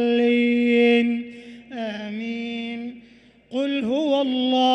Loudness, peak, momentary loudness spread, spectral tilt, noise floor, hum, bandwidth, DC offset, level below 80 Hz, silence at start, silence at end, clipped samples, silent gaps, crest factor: -22 LUFS; -8 dBFS; 16 LU; -5.5 dB/octave; -51 dBFS; none; 8.2 kHz; under 0.1%; -68 dBFS; 0 s; 0 s; under 0.1%; none; 14 dB